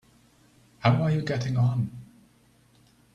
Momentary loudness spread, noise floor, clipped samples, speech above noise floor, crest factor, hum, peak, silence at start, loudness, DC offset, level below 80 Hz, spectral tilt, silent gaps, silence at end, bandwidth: 10 LU; -61 dBFS; under 0.1%; 37 dB; 24 dB; none; -6 dBFS; 0.8 s; -26 LUFS; under 0.1%; -60 dBFS; -7.5 dB/octave; none; 1.1 s; 7.4 kHz